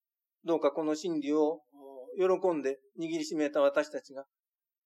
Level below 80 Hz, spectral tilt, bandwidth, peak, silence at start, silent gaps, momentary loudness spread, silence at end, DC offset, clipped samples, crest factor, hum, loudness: under -90 dBFS; -5 dB/octave; 12 kHz; -14 dBFS; 0.45 s; none; 15 LU; 0.65 s; under 0.1%; under 0.1%; 18 dB; none; -31 LUFS